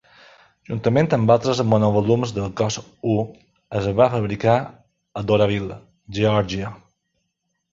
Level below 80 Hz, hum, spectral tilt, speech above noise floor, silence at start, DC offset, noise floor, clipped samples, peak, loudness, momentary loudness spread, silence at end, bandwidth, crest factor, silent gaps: -48 dBFS; none; -6.5 dB/octave; 55 dB; 0.7 s; under 0.1%; -75 dBFS; under 0.1%; -2 dBFS; -20 LUFS; 15 LU; 0.95 s; 7.6 kHz; 20 dB; none